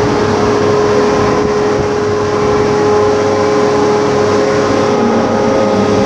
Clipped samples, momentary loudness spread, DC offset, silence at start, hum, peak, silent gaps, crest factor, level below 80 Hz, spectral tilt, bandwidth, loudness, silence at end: under 0.1%; 2 LU; under 0.1%; 0 s; none; 0 dBFS; none; 10 dB; -36 dBFS; -5.5 dB/octave; 9.6 kHz; -11 LUFS; 0 s